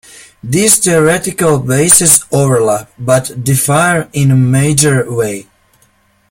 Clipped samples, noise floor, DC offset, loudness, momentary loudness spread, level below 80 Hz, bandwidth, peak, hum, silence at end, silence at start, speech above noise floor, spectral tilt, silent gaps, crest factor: 0.4%; -53 dBFS; under 0.1%; -10 LUFS; 10 LU; -44 dBFS; over 20 kHz; 0 dBFS; none; 0.9 s; 0.15 s; 42 dB; -4 dB/octave; none; 12 dB